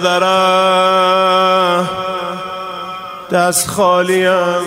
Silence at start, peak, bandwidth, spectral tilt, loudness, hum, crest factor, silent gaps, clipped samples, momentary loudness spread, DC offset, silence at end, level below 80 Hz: 0 s; 0 dBFS; 16 kHz; -3 dB/octave; -13 LUFS; none; 14 dB; none; under 0.1%; 13 LU; under 0.1%; 0 s; -54 dBFS